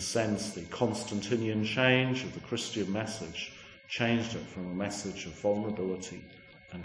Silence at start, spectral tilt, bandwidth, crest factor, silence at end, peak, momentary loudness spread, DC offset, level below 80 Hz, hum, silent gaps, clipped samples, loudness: 0 s; -4.5 dB/octave; 10.5 kHz; 22 dB; 0 s; -10 dBFS; 12 LU; under 0.1%; -62 dBFS; none; none; under 0.1%; -32 LUFS